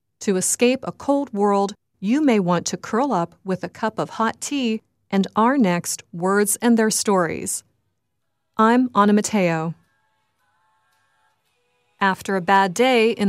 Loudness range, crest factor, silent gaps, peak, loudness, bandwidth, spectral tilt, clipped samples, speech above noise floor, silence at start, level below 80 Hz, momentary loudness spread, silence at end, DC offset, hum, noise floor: 4 LU; 18 dB; none; -2 dBFS; -20 LUFS; 15.5 kHz; -4.5 dB/octave; under 0.1%; 57 dB; 0.2 s; -66 dBFS; 10 LU; 0 s; under 0.1%; none; -77 dBFS